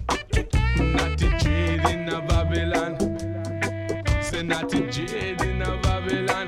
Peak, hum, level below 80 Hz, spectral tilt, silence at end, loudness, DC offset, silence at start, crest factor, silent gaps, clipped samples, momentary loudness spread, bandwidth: -6 dBFS; none; -28 dBFS; -5.5 dB/octave; 0 s; -25 LUFS; under 0.1%; 0 s; 18 dB; none; under 0.1%; 5 LU; 14 kHz